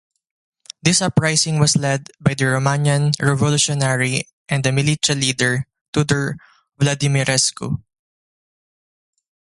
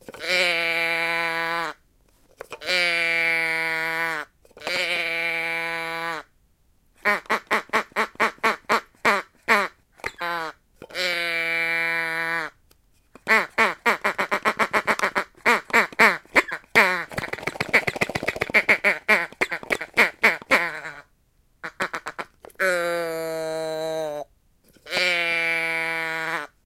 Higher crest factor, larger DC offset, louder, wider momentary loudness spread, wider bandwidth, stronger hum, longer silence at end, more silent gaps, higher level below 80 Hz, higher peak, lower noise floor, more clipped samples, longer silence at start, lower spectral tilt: second, 18 dB vs 24 dB; neither; first, -18 LUFS vs -22 LUFS; second, 8 LU vs 13 LU; second, 11.5 kHz vs 16.5 kHz; neither; first, 1.75 s vs 0.2 s; first, 4.33-4.45 s, 5.81-5.93 s vs none; first, -50 dBFS vs -60 dBFS; about the same, -2 dBFS vs 0 dBFS; first, under -90 dBFS vs -63 dBFS; neither; first, 0.85 s vs 0.1 s; first, -4 dB/octave vs -2.5 dB/octave